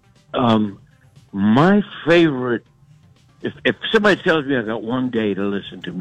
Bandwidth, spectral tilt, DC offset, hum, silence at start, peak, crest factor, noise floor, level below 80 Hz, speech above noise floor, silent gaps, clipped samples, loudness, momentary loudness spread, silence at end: 8.8 kHz; -7 dB/octave; under 0.1%; none; 0.35 s; -2 dBFS; 16 dB; -51 dBFS; -54 dBFS; 33 dB; none; under 0.1%; -18 LUFS; 13 LU; 0 s